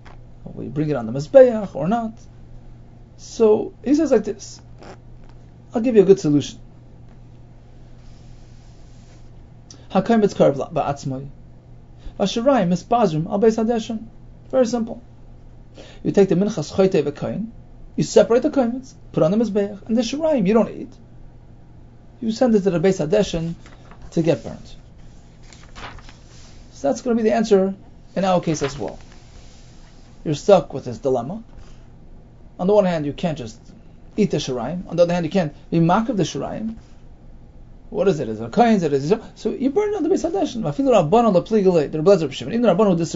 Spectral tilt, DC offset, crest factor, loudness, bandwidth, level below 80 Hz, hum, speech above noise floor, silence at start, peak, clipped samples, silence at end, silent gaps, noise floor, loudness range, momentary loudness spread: -6.5 dB/octave; under 0.1%; 20 dB; -19 LUFS; 8 kHz; -44 dBFS; none; 24 dB; 0.05 s; 0 dBFS; under 0.1%; 0 s; none; -43 dBFS; 5 LU; 16 LU